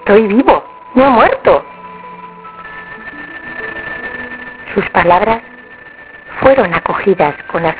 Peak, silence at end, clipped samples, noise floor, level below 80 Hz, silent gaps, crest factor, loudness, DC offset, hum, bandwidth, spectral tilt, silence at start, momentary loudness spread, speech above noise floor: 0 dBFS; 0 s; 0.4%; -35 dBFS; -40 dBFS; none; 14 dB; -12 LUFS; under 0.1%; none; 4 kHz; -9.5 dB/octave; 0 s; 22 LU; 25 dB